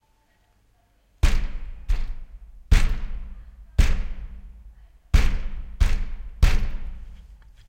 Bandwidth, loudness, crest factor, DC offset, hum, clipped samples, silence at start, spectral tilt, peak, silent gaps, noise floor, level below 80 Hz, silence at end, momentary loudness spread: 9.6 kHz; -27 LUFS; 18 dB; under 0.1%; none; under 0.1%; 1.25 s; -5 dB/octave; -6 dBFS; none; -63 dBFS; -24 dBFS; 0.5 s; 22 LU